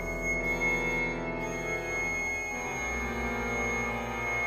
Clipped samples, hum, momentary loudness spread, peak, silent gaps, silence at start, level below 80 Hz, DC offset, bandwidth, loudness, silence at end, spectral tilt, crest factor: under 0.1%; none; 5 LU; -18 dBFS; none; 0 s; -44 dBFS; under 0.1%; 15.5 kHz; -30 LUFS; 0 s; -4 dB/octave; 14 dB